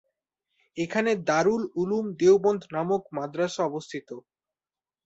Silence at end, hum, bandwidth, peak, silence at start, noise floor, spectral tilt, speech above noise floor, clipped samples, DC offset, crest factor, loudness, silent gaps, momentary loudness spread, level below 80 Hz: 0.85 s; none; 8 kHz; -10 dBFS; 0.75 s; under -90 dBFS; -5.5 dB/octave; over 65 dB; under 0.1%; under 0.1%; 18 dB; -26 LUFS; none; 17 LU; -68 dBFS